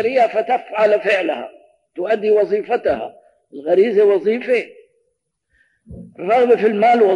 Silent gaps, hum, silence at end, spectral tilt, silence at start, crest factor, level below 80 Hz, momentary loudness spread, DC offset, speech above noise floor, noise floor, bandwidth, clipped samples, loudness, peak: none; none; 0 s; -6 dB/octave; 0 s; 14 dB; -58 dBFS; 15 LU; under 0.1%; 55 dB; -70 dBFS; 10 kHz; under 0.1%; -17 LUFS; -2 dBFS